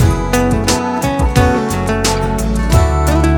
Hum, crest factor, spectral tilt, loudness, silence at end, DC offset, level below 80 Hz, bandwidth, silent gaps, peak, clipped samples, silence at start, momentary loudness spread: none; 12 dB; -5.5 dB/octave; -14 LUFS; 0 s; under 0.1%; -18 dBFS; 17.5 kHz; none; 0 dBFS; under 0.1%; 0 s; 4 LU